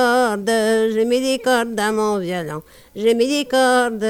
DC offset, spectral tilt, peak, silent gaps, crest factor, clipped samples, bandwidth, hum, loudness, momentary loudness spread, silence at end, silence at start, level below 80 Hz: under 0.1%; -3.5 dB/octave; -4 dBFS; none; 14 dB; under 0.1%; 16.5 kHz; none; -18 LUFS; 9 LU; 0 s; 0 s; -56 dBFS